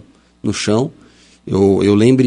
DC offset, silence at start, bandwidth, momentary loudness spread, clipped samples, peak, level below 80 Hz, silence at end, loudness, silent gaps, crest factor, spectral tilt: under 0.1%; 0.45 s; 11 kHz; 12 LU; under 0.1%; 0 dBFS; -50 dBFS; 0 s; -15 LUFS; none; 14 dB; -6.5 dB/octave